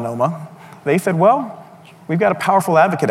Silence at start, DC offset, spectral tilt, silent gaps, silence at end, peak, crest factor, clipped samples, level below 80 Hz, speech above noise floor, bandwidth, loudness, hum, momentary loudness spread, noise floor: 0 s; under 0.1%; -6.5 dB/octave; none; 0 s; -2 dBFS; 14 dB; under 0.1%; -66 dBFS; 25 dB; 16 kHz; -16 LUFS; none; 15 LU; -41 dBFS